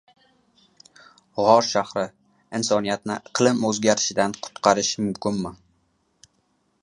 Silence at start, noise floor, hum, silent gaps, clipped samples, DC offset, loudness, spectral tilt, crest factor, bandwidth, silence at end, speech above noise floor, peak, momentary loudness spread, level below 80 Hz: 1.35 s; -68 dBFS; none; none; under 0.1%; under 0.1%; -22 LUFS; -3.5 dB/octave; 24 dB; 11 kHz; 1.3 s; 46 dB; -2 dBFS; 12 LU; -62 dBFS